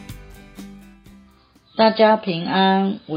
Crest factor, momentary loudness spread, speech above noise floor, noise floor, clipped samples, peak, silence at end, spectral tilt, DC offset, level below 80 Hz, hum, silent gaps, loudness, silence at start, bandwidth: 18 dB; 25 LU; 36 dB; -54 dBFS; under 0.1%; -2 dBFS; 0 s; -7 dB/octave; under 0.1%; -50 dBFS; none; none; -17 LUFS; 0 s; 15.5 kHz